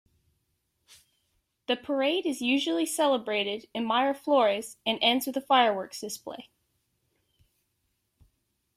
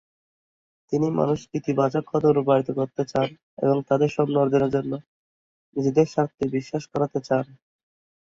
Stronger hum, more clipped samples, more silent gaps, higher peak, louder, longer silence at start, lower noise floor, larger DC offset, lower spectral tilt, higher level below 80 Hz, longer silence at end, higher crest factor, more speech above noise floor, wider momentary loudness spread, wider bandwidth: neither; neither; second, none vs 3.43-3.57 s, 5.07-5.72 s; about the same, -8 dBFS vs -6 dBFS; second, -27 LUFS vs -24 LUFS; first, 1.7 s vs 0.9 s; second, -77 dBFS vs under -90 dBFS; neither; second, -2.5 dB/octave vs -7.5 dB/octave; second, -74 dBFS vs -60 dBFS; first, 2.35 s vs 0.85 s; about the same, 20 dB vs 18 dB; second, 50 dB vs over 67 dB; first, 13 LU vs 8 LU; first, 16 kHz vs 7.6 kHz